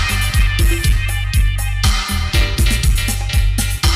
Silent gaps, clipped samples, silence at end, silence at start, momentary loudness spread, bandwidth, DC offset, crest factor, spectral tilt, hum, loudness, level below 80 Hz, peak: none; under 0.1%; 0 s; 0 s; 3 LU; 16 kHz; under 0.1%; 12 dB; -3.5 dB/octave; none; -17 LUFS; -16 dBFS; -2 dBFS